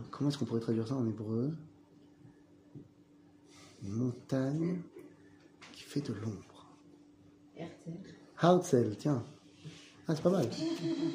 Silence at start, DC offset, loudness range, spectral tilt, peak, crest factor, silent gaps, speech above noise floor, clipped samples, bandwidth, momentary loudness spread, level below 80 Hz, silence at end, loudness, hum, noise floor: 0 s; under 0.1%; 10 LU; -7 dB/octave; -12 dBFS; 24 dB; none; 28 dB; under 0.1%; 15 kHz; 22 LU; -74 dBFS; 0 s; -34 LUFS; none; -62 dBFS